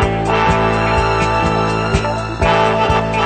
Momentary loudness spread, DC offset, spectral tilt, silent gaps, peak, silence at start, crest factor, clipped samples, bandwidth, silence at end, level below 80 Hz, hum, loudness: 4 LU; under 0.1%; -6 dB/octave; none; -2 dBFS; 0 s; 14 dB; under 0.1%; 9 kHz; 0 s; -26 dBFS; none; -15 LUFS